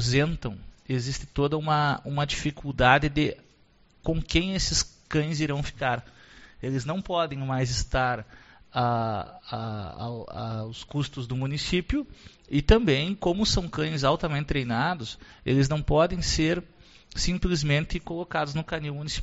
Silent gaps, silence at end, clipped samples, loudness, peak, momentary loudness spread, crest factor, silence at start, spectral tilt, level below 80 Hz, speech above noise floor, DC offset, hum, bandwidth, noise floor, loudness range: none; 0 s; under 0.1%; -27 LUFS; -4 dBFS; 12 LU; 22 dB; 0 s; -4.5 dB/octave; -38 dBFS; 33 dB; under 0.1%; none; 8 kHz; -60 dBFS; 5 LU